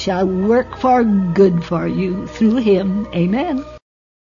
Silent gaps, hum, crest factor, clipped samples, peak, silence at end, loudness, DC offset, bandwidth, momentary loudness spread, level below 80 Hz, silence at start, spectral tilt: none; none; 14 dB; under 0.1%; -2 dBFS; 0.5 s; -16 LUFS; under 0.1%; 7.4 kHz; 8 LU; -42 dBFS; 0 s; -8 dB/octave